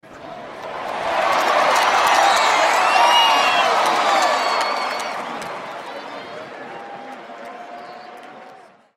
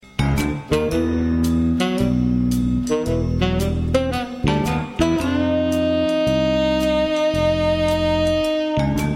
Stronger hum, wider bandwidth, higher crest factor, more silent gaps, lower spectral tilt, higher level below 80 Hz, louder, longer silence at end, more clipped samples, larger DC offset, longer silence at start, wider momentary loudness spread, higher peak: neither; about the same, 16 kHz vs 16.5 kHz; about the same, 16 dB vs 16 dB; neither; second, -0.5 dB/octave vs -6.5 dB/octave; second, -64 dBFS vs -32 dBFS; first, -16 LUFS vs -20 LUFS; first, 0.4 s vs 0 s; neither; neither; about the same, 0.05 s vs 0.15 s; first, 21 LU vs 3 LU; about the same, -4 dBFS vs -2 dBFS